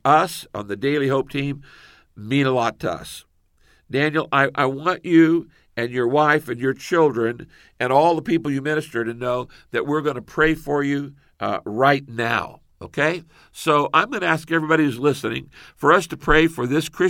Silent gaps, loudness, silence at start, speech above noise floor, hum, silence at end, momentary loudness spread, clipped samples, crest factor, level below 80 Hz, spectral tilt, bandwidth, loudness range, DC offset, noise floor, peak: none; -21 LUFS; 0.05 s; 38 dB; none; 0 s; 12 LU; under 0.1%; 20 dB; -44 dBFS; -6 dB/octave; 17 kHz; 4 LU; under 0.1%; -58 dBFS; -2 dBFS